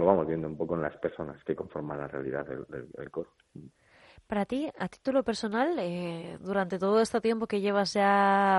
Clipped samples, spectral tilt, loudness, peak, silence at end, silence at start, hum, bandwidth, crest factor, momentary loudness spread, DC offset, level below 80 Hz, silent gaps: under 0.1%; -6 dB/octave; -30 LUFS; -8 dBFS; 0 s; 0 s; none; 11.5 kHz; 22 dB; 14 LU; under 0.1%; -64 dBFS; none